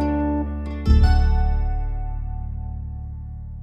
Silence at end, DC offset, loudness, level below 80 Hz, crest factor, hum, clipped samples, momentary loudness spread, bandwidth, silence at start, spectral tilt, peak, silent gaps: 0 s; under 0.1%; -23 LUFS; -22 dBFS; 16 dB; none; under 0.1%; 16 LU; 5.6 kHz; 0 s; -8.5 dB/octave; -6 dBFS; none